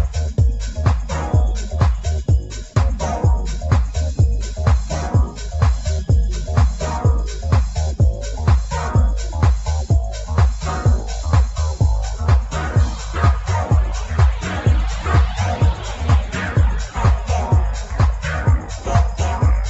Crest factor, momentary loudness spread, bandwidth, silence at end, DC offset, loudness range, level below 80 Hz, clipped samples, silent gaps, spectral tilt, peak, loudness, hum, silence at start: 14 dB; 4 LU; 8.2 kHz; 0 s; under 0.1%; 1 LU; -20 dBFS; under 0.1%; none; -6 dB/octave; -2 dBFS; -19 LUFS; none; 0 s